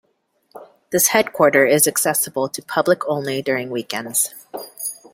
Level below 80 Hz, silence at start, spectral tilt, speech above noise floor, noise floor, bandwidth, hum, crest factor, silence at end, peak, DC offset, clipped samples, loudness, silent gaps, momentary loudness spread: -64 dBFS; 0.55 s; -2.5 dB/octave; 46 dB; -64 dBFS; 16.5 kHz; none; 18 dB; 0.2 s; -2 dBFS; under 0.1%; under 0.1%; -18 LUFS; none; 13 LU